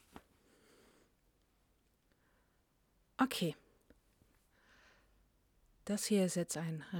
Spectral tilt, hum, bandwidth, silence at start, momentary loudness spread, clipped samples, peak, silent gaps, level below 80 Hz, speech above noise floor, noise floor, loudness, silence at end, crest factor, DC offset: -4.5 dB/octave; none; 19 kHz; 3.2 s; 19 LU; under 0.1%; -18 dBFS; none; -74 dBFS; 39 dB; -76 dBFS; -37 LUFS; 0 s; 24 dB; under 0.1%